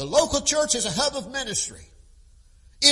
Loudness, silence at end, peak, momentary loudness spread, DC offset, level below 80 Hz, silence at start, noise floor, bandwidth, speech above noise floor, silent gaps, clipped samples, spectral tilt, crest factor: -23 LUFS; 0 s; 0 dBFS; 8 LU; under 0.1%; -48 dBFS; 0 s; -52 dBFS; 11.5 kHz; 28 dB; none; under 0.1%; -1.5 dB/octave; 24 dB